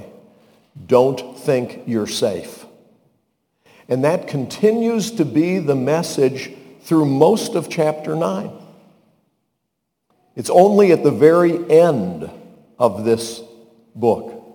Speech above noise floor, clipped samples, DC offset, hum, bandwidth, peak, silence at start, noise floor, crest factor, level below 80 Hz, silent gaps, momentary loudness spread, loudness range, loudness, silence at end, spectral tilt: 59 dB; under 0.1%; under 0.1%; none; 19 kHz; 0 dBFS; 0 s; -75 dBFS; 18 dB; -64 dBFS; none; 16 LU; 7 LU; -17 LUFS; 0.15 s; -6 dB/octave